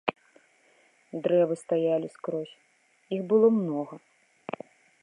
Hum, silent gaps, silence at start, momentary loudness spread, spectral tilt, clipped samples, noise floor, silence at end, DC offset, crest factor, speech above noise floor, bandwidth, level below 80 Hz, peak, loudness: none; none; 0.05 s; 20 LU; -7.5 dB/octave; under 0.1%; -63 dBFS; 0.5 s; under 0.1%; 22 dB; 37 dB; 11 kHz; -84 dBFS; -6 dBFS; -27 LUFS